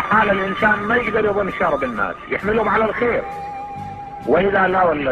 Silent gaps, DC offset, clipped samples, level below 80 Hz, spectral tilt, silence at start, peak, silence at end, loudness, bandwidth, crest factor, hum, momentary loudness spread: none; under 0.1%; under 0.1%; -42 dBFS; -7 dB/octave; 0 s; -4 dBFS; 0 s; -18 LUFS; 11.5 kHz; 14 dB; none; 14 LU